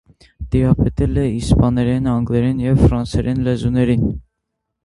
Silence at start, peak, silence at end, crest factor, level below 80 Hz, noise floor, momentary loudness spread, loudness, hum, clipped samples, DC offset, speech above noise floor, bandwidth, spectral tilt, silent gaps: 0.4 s; 0 dBFS; 0.65 s; 16 dB; -26 dBFS; -76 dBFS; 5 LU; -17 LUFS; none; under 0.1%; under 0.1%; 61 dB; 11.5 kHz; -8.5 dB/octave; none